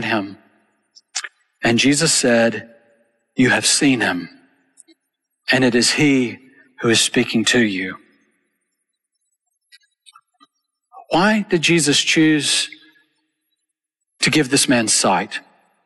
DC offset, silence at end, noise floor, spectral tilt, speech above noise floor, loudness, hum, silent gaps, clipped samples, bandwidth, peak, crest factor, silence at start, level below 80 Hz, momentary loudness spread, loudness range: under 0.1%; 0.45 s; -79 dBFS; -3 dB/octave; 62 dB; -16 LUFS; none; none; under 0.1%; 12 kHz; -4 dBFS; 16 dB; 0 s; -56 dBFS; 14 LU; 6 LU